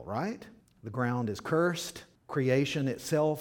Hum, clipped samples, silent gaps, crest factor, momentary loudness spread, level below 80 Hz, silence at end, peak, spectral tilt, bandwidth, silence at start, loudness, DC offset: none; under 0.1%; none; 18 dB; 13 LU; -66 dBFS; 0 s; -14 dBFS; -6 dB/octave; 18.5 kHz; 0 s; -31 LUFS; under 0.1%